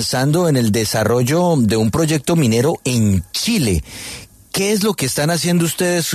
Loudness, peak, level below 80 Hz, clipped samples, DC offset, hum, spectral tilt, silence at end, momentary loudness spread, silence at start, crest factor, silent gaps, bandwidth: -16 LUFS; -4 dBFS; -40 dBFS; under 0.1%; under 0.1%; none; -5 dB/octave; 0 s; 6 LU; 0 s; 12 dB; none; 14 kHz